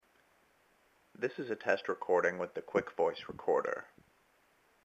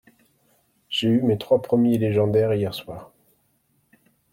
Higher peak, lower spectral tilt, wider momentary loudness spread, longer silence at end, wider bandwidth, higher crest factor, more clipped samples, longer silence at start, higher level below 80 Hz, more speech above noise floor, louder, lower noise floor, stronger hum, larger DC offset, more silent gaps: second, -14 dBFS vs -8 dBFS; second, -5.5 dB/octave vs -7.5 dB/octave; second, 9 LU vs 13 LU; second, 1 s vs 1.3 s; second, 8 kHz vs 16.5 kHz; first, 22 dB vs 16 dB; neither; first, 1.2 s vs 0.9 s; second, -76 dBFS vs -60 dBFS; second, 36 dB vs 46 dB; second, -35 LUFS vs -21 LUFS; about the same, -70 dBFS vs -67 dBFS; neither; neither; neither